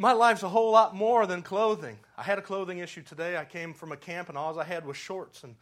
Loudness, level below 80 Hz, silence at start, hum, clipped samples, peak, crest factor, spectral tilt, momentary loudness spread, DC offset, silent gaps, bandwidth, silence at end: -27 LUFS; -78 dBFS; 0 s; none; under 0.1%; -6 dBFS; 22 dB; -4.5 dB/octave; 17 LU; under 0.1%; none; 13 kHz; 0.1 s